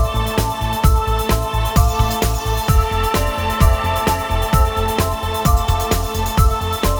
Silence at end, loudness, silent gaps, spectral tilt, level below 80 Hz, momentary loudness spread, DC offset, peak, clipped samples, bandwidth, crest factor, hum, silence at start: 0 s; -18 LUFS; none; -5 dB/octave; -20 dBFS; 3 LU; under 0.1%; 0 dBFS; under 0.1%; over 20 kHz; 16 dB; none; 0 s